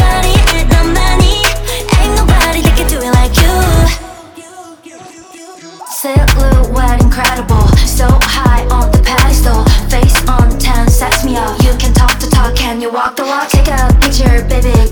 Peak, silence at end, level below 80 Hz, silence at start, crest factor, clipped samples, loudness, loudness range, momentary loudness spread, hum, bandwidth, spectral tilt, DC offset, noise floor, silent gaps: 0 dBFS; 0 s; -10 dBFS; 0 s; 8 dB; under 0.1%; -10 LUFS; 4 LU; 5 LU; none; over 20 kHz; -4.5 dB/octave; 0.9%; -33 dBFS; none